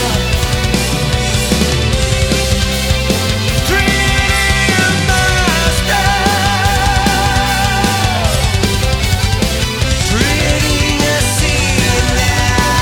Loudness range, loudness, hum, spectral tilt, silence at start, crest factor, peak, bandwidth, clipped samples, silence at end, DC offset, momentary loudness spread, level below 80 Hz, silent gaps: 2 LU; -12 LUFS; none; -3.5 dB/octave; 0 s; 12 dB; 0 dBFS; 19 kHz; under 0.1%; 0 s; under 0.1%; 3 LU; -20 dBFS; none